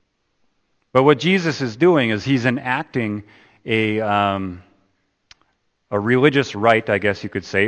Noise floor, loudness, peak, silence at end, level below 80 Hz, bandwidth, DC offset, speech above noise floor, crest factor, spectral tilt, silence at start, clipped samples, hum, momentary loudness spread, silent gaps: -66 dBFS; -18 LUFS; 0 dBFS; 0 s; -60 dBFS; 8.8 kHz; under 0.1%; 48 dB; 20 dB; -6.5 dB/octave; 0.95 s; under 0.1%; none; 11 LU; none